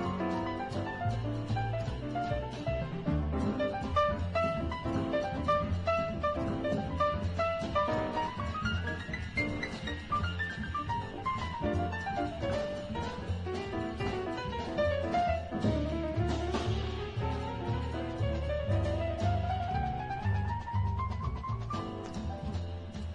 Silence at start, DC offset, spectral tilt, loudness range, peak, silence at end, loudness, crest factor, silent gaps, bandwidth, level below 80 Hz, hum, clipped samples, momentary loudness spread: 0 s; under 0.1%; -7 dB/octave; 3 LU; -18 dBFS; 0 s; -34 LUFS; 16 dB; none; 10 kHz; -44 dBFS; none; under 0.1%; 6 LU